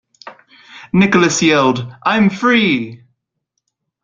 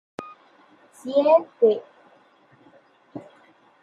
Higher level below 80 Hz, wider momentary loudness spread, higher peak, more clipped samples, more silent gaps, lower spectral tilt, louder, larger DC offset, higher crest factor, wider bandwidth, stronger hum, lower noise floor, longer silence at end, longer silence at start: first, -52 dBFS vs -80 dBFS; second, 7 LU vs 24 LU; first, -2 dBFS vs -6 dBFS; neither; neither; second, -4.5 dB/octave vs -6 dB/octave; first, -13 LUFS vs -21 LUFS; neither; second, 14 dB vs 20 dB; second, 9 kHz vs 11.5 kHz; neither; first, -74 dBFS vs -57 dBFS; first, 1.05 s vs 0.65 s; about the same, 0.25 s vs 0.2 s